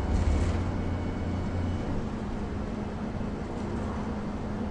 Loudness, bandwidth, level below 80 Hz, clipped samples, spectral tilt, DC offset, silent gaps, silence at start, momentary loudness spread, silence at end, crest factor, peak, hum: -32 LUFS; 9.8 kHz; -36 dBFS; under 0.1%; -7.5 dB/octave; under 0.1%; none; 0 s; 6 LU; 0 s; 16 dB; -14 dBFS; none